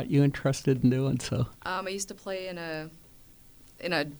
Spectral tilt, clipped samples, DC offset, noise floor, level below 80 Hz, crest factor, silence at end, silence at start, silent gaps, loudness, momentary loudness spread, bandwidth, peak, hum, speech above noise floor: -6 dB/octave; under 0.1%; under 0.1%; -54 dBFS; -54 dBFS; 18 dB; 0 s; 0 s; none; -29 LUFS; 12 LU; over 20 kHz; -12 dBFS; none; 25 dB